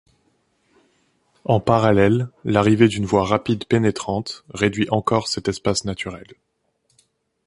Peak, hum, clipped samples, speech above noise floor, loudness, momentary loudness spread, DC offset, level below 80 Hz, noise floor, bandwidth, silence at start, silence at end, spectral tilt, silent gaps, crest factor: -2 dBFS; none; under 0.1%; 49 dB; -20 LUFS; 12 LU; under 0.1%; -46 dBFS; -68 dBFS; 11.5 kHz; 1.5 s; 1.25 s; -6 dB/octave; none; 20 dB